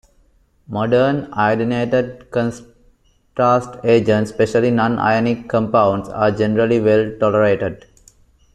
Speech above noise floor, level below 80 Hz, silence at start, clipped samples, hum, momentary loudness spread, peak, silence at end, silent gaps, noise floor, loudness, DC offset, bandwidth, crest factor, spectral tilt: 39 dB; -48 dBFS; 0.7 s; under 0.1%; none; 7 LU; -2 dBFS; 0.8 s; none; -56 dBFS; -17 LUFS; under 0.1%; 10 kHz; 16 dB; -7 dB/octave